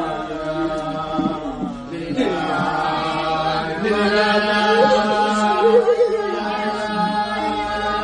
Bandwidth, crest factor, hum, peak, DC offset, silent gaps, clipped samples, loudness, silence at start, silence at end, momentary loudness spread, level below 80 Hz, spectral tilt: 10 kHz; 16 dB; none; -2 dBFS; under 0.1%; none; under 0.1%; -19 LUFS; 0 s; 0 s; 10 LU; -46 dBFS; -5 dB/octave